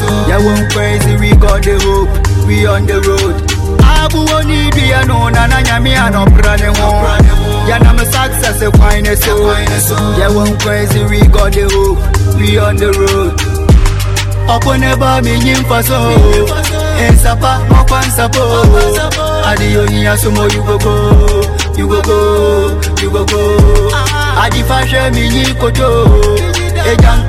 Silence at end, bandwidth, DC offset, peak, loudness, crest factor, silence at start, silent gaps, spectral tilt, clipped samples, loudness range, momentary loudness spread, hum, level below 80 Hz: 0 s; 14.5 kHz; under 0.1%; 0 dBFS; -10 LUFS; 8 dB; 0 s; none; -5 dB/octave; 0.6%; 1 LU; 4 LU; none; -12 dBFS